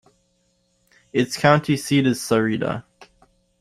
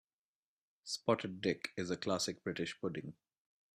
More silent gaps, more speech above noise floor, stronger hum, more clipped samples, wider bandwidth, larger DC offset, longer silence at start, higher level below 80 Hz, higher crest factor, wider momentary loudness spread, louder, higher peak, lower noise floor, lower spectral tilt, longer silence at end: neither; second, 47 dB vs over 51 dB; neither; neither; first, 15.5 kHz vs 13 kHz; neither; first, 1.15 s vs 0.85 s; first, -58 dBFS vs -76 dBFS; about the same, 20 dB vs 22 dB; about the same, 9 LU vs 10 LU; first, -20 LUFS vs -39 LUFS; first, -2 dBFS vs -18 dBFS; second, -66 dBFS vs under -90 dBFS; first, -5.5 dB/octave vs -4 dB/octave; about the same, 0.55 s vs 0.6 s